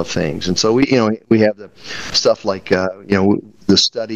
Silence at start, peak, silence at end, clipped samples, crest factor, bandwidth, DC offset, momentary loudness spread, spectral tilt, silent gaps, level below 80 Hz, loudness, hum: 0 s; 0 dBFS; 0 s; under 0.1%; 16 dB; 10 kHz; under 0.1%; 7 LU; -4.5 dB/octave; none; -48 dBFS; -16 LUFS; none